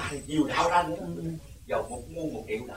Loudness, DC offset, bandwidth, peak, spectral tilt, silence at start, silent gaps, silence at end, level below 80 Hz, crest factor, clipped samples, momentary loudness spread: -30 LUFS; 0.1%; 16 kHz; -12 dBFS; -5 dB/octave; 0 s; none; 0 s; -50 dBFS; 18 dB; under 0.1%; 13 LU